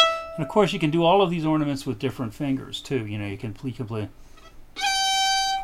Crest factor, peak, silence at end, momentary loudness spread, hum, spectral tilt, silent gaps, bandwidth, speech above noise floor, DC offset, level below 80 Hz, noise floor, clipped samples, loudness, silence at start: 20 dB; -4 dBFS; 0 s; 13 LU; none; -4 dB/octave; none; 16 kHz; 19 dB; under 0.1%; -48 dBFS; -43 dBFS; under 0.1%; -24 LUFS; 0 s